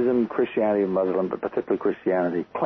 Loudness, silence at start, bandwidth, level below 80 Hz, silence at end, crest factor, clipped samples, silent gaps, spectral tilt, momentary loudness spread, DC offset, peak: -24 LUFS; 0 s; 5.4 kHz; -62 dBFS; 0 s; 12 dB; under 0.1%; none; -9.5 dB/octave; 4 LU; under 0.1%; -12 dBFS